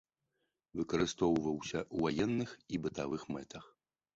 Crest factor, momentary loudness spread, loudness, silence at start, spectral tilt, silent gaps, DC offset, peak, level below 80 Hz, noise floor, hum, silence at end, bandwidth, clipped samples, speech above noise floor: 18 dB; 12 LU; -36 LUFS; 0.75 s; -5.5 dB/octave; none; under 0.1%; -18 dBFS; -62 dBFS; -84 dBFS; none; 0.5 s; 8 kHz; under 0.1%; 48 dB